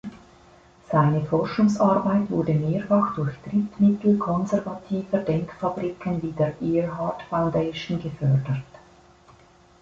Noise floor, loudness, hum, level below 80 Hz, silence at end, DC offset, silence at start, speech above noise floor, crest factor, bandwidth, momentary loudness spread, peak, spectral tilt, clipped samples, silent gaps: -54 dBFS; -24 LUFS; none; -54 dBFS; 1.15 s; under 0.1%; 0.05 s; 31 dB; 16 dB; 7.6 kHz; 9 LU; -8 dBFS; -8.5 dB/octave; under 0.1%; none